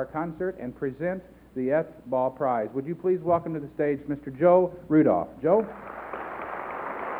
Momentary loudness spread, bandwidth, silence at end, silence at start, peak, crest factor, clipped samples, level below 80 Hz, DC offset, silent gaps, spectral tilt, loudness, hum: 14 LU; 4.1 kHz; 0 s; 0 s; -8 dBFS; 18 dB; under 0.1%; -58 dBFS; under 0.1%; none; -10 dB/octave; -27 LUFS; none